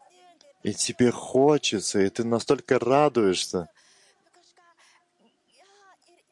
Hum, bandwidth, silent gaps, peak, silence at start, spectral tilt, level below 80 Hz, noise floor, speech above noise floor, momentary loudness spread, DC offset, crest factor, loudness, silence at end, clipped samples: none; 12 kHz; none; -8 dBFS; 0.65 s; -4.5 dB/octave; -68 dBFS; -66 dBFS; 43 dB; 12 LU; under 0.1%; 18 dB; -24 LUFS; 2.65 s; under 0.1%